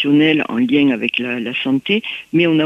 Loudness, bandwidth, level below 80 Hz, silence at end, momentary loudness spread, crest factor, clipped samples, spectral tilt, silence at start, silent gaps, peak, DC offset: -16 LUFS; 6.2 kHz; -60 dBFS; 0 s; 6 LU; 12 dB; under 0.1%; -7 dB/octave; 0 s; none; -2 dBFS; under 0.1%